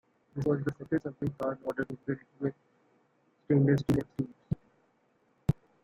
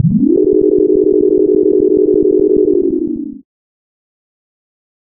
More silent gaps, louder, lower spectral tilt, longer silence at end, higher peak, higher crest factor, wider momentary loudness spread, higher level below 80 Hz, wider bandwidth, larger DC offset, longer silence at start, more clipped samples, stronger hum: neither; second, -32 LUFS vs -11 LUFS; second, -9 dB/octave vs -16.5 dB/octave; second, 0.3 s vs 1.75 s; second, -14 dBFS vs -2 dBFS; first, 20 dB vs 12 dB; first, 12 LU vs 7 LU; second, -56 dBFS vs -40 dBFS; first, 10 kHz vs 1.2 kHz; neither; first, 0.35 s vs 0 s; neither; neither